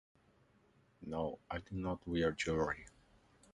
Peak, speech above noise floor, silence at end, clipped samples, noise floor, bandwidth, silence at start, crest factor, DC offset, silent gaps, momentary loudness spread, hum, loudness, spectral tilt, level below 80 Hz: -24 dBFS; 32 dB; 0.65 s; under 0.1%; -71 dBFS; 11 kHz; 1 s; 18 dB; under 0.1%; none; 10 LU; none; -39 LUFS; -5.5 dB/octave; -58 dBFS